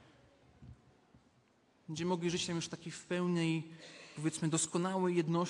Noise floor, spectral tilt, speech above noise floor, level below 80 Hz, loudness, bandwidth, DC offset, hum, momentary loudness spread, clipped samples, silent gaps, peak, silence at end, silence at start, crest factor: -70 dBFS; -5 dB/octave; 35 dB; -72 dBFS; -36 LUFS; 11.5 kHz; under 0.1%; none; 13 LU; under 0.1%; none; -20 dBFS; 0 s; 0.6 s; 16 dB